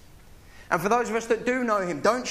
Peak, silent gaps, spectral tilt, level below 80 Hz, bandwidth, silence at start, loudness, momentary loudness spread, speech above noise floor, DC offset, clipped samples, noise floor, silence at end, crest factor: -6 dBFS; none; -4.5 dB/octave; -54 dBFS; 15.5 kHz; 0.15 s; -25 LUFS; 3 LU; 24 dB; under 0.1%; under 0.1%; -49 dBFS; 0 s; 20 dB